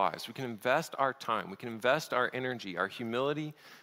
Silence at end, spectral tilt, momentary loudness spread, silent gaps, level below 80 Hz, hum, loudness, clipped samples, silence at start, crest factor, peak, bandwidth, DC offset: 0 s; -4.5 dB/octave; 9 LU; none; -76 dBFS; none; -33 LUFS; under 0.1%; 0 s; 20 dB; -12 dBFS; 16 kHz; under 0.1%